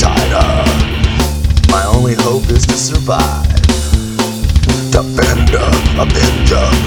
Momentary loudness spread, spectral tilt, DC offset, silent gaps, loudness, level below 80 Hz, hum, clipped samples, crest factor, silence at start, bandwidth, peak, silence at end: 3 LU; -5 dB/octave; under 0.1%; none; -12 LUFS; -14 dBFS; none; 0.1%; 10 dB; 0 s; 19 kHz; 0 dBFS; 0 s